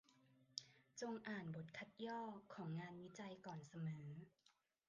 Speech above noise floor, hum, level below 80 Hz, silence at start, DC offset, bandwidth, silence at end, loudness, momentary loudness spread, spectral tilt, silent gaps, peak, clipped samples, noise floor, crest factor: 23 dB; none; -88 dBFS; 0.1 s; under 0.1%; 9.4 kHz; 0.4 s; -53 LUFS; 6 LU; -5.5 dB/octave; none; -28 dBFS; under 0.1%; -75 dBFS; 26 dB